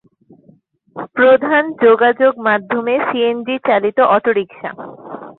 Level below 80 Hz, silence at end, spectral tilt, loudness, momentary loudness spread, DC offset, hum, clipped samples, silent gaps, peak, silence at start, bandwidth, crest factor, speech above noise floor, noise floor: -62 dBFS; 0.05 s; -9 dB/octave; -14 LUFS; 19 LU; under 0.1%; none; under 0.1%; none; 0 dBFS; 0.95 s; 4.1 kHz; 14 dB; 37 dB; -51 dBFS